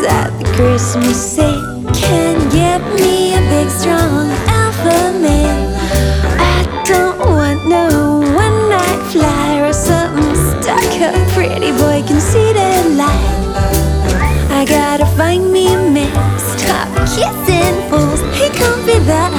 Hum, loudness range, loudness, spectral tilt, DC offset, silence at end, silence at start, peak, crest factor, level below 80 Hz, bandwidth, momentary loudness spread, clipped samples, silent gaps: none; 1 LU; -12 LUFS; -5 dB/octave; under 0.1%; 0 s; 0 s; 0 dBFS; 12 dB; -22 dBFS; over 20 kHz; 3 LU; under 0.1%; none